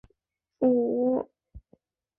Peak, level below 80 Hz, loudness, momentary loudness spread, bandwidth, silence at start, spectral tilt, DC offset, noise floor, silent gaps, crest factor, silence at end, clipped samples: -12 dBFS; -58 dBFS; -26 LUFS; 8 LU; 2.8 kHz; 0.6 s; -12 dB/octave; under 0.1%; -81 dBFS; none; 16 dB; 0.6 s; under 0.1%